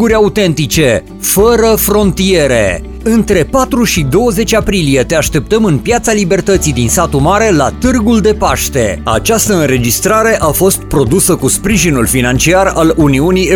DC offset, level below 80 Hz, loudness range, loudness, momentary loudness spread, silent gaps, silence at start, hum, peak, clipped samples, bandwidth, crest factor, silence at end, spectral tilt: 0.2%; -24 dBFS; 1 LU; -10 LUFS; 3 LU; none; 0 s; none; 0 dBFS; under 0.1%; 19 kHz; 10 dB; 0 s; -4.5 dB/octave